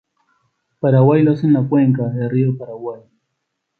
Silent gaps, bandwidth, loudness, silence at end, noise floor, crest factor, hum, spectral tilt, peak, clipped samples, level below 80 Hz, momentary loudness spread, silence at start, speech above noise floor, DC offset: none; 4.7 kHz; -16 LUFS; 0.8 s; -75 dBFS; 16 dB; none; -12 dB/octave; -2 dBFS; under 0.1%; -60 dBFS; 15 LU; 0.85 s; 60 dB; under 0.1%